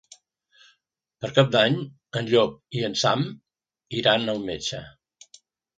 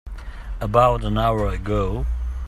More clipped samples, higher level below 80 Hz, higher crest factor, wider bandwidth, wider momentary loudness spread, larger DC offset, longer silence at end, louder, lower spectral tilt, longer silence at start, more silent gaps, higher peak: neither; second, -62 dBFS vs -28 dBFS; about the same, 22 dB vs 20 dB; second, 9.2 kHz vs 13 kHz; second, 12 LU vs 19 LU; neither; first, 0.9 s vs 0 s; second, -24 LUFS vs -21 LUFS; second, -4.5 dB/octave vs -7.5 dB/octave; first, 1.2 s vs 0.05 s; neither; about the same, -4 dBFS vs -2 dBFS